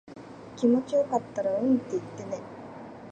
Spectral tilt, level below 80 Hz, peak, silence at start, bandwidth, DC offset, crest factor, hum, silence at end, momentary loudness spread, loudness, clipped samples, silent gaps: -7 dB/octave; -68 dBFS; -12 dBFS; 0.05 s; 8.8 kHz; under 0.1%; 16 dB; none; 0 s; 19 LU; -28 LUFS; under 0.1%; none